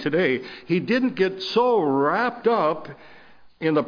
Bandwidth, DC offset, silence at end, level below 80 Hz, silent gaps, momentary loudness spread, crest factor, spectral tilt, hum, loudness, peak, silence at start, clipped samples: 5.4 kHz; under 0.1%; 0 s; -64 dBFS; none; 8 LU; 14 dB; -7 dB/octave; none; -22 LUFS; -8 dBFS; 0 s; under 0.1%